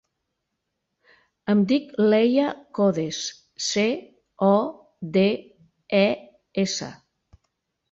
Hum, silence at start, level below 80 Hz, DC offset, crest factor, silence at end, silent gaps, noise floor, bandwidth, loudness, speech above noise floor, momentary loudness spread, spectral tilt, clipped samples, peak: none; 1.45 s; -66 dBFS; under 0.1%; 18 dB; 0.95 s; none; -79 dBFS; 7.8 kHz; -23 LUFS; 58 dB; 13 LU; -5 dB/octave; under 0.1%; -8 dBFS